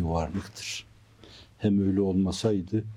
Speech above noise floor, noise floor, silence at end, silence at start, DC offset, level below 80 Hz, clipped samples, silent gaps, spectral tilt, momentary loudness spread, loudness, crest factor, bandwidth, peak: 25 dB; -52 dBFS; 0 s; 0 s; under 0.1%; -50 dBFS; under 0.1%; none; -6.5 dB/octave; 11 LU; -28 LUFS; 16 dB; 12.5 kHz; -12 dBFS